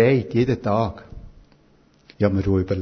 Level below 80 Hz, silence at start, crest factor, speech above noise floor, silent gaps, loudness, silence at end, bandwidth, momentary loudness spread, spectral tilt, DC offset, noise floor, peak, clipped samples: -40 dBFS; 0 s; 18 dB; 36 dB; none; -22 LUFS; 0 s; 6.4 kHz; 7 LU; -9 dB/octave; under 0.1%; -56 dBFS; -4 dBFS; under 0.1%